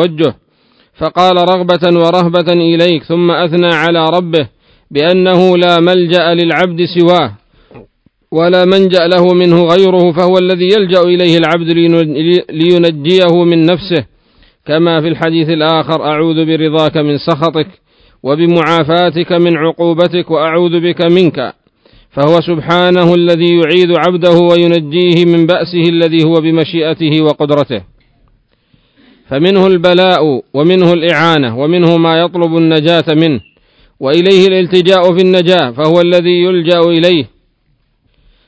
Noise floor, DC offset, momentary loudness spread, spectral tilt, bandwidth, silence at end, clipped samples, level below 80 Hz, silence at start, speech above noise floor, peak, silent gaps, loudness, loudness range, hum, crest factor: -57 dBFS; under 0.1%; 6 LU; -7.5 dB/octave; 8 kHz; 1.2 s; 1%; -50 dBFS; 0 s; 48 dB; 0 dBFS; none; -9 LUFS; 4 LU; none; 10 dB